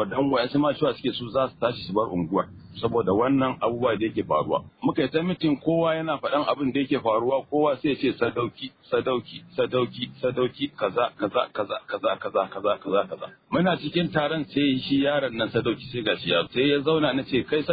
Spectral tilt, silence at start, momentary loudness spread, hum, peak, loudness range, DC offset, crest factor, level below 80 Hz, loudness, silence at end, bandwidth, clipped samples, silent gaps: -10 dB/octave; 0 s; 6 LU; none; -8 dBFS; 3 LU; under 0.1%; 16 dB; -58 dBFS; -25 LUFS; 0 s; 5 kHz; under 0.1%; none